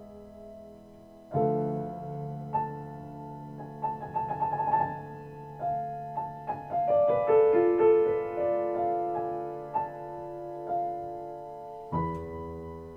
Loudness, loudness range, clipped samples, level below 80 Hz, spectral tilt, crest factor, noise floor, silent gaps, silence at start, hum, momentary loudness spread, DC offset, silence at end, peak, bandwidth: -30 LUFS; 9 LU; under 0.1%; -58 dBFS; -10 dB/octave; 18 dB; -51 dBFS; none; 0 s; none; 19 LU; under 0.1%; 0 s; -12 dBFS; 4.8 kHz